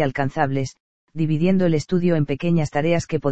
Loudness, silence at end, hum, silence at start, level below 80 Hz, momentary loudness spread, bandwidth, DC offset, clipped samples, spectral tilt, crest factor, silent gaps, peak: -21 LUFS; 0 s; none; 0 s; -48 dBFS; 8 LU; 8.2 kHz; 2%; under 0.1%; -7.5 dB/octave; 16 dB; 0.80-1.07 s; -4 dBFS